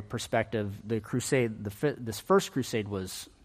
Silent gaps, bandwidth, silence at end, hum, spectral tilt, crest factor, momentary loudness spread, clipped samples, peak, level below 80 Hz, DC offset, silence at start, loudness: none; 15.5 kHz; 0.2 s; none; -5 dB/octave; 18 dB; 9 LU; under 0.1%; -12 dBFS; -60 dBFS; under 0.1%; 0 s; -31 LUFS